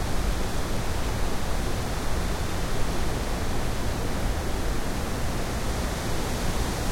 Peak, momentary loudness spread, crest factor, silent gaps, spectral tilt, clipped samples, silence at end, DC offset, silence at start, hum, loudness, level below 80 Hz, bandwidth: -12 dBFS; 1 LU; 14 dB; none; -4.5 dB/octave; under 0.1%; 0 s; under 0.1%; 0 s; none; -30 LUFS; -30 dBFS; 16.5 kHz